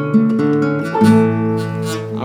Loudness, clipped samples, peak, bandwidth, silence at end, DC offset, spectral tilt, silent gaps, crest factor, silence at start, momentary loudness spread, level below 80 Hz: -15 LUFS; under 0.1%; -2 dBFS; 14.5 kHz; 0 s; under 0.1%; -7.5 dB/octave; none; 14 dB; 0 s; 10 LU; -60 dBFS